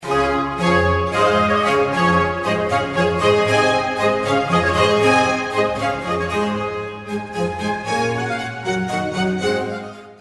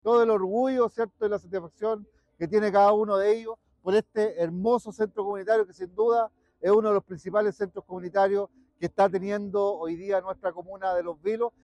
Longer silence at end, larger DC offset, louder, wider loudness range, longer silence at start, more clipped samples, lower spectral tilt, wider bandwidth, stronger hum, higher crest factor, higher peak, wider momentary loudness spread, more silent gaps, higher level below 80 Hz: about the same, 0.05 s vs 0.15 s; neither; first, -18 LUFS vs -26 LUFS; first, 6 LU vs 3 LU; about the same, 0 s vs 0.05 s; neither; second, -5 dB/octave vs -7 dB/octave; first, 11.5 kHz vs 9.8 kHz; neither; about the same, 16 dB vs 14 dB; first, -2 dBFS vs -12 dBFS; second, 9 LU vs 12 LU; neither; first, -42 dBFS vs -66 dBFS